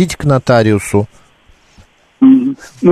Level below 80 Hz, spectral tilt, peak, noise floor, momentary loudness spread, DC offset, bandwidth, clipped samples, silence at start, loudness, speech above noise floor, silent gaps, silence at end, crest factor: -40 dBFS; -7 dB/octave; 0 dBFS; -47 dBFS; 9 LU; under 0.1%; 13.5 kHz; under 0.1%; 0 s; -12 LUFS; 36 dB; none; 0 s; 12 dB